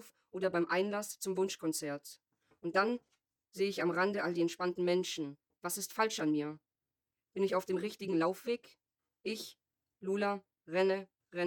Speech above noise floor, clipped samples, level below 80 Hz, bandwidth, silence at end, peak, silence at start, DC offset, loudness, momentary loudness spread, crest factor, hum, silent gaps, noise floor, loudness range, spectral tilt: over 55 dB; under 0.1%; -84 dBFS; 20 kHz; 0 s; -18 dBFS; 0 s; under 0.1%; -36 LUFS; 13 LU; 20 dB; none; none; under -90 dBFS; 3 LU; -4.5 dB/octave